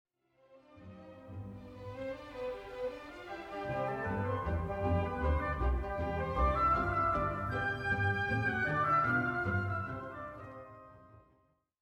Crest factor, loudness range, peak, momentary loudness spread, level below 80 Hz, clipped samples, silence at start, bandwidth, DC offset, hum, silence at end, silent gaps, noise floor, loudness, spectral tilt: 16 dB; 11 LU; -20 dBFS; 18 LU; -44 dBFS; under 0.1%; 0.5 s; 11 kHz; under 0.1%; none; 0.8 s; none; -72 dBFS; -34 LUFS; -8 dB/octave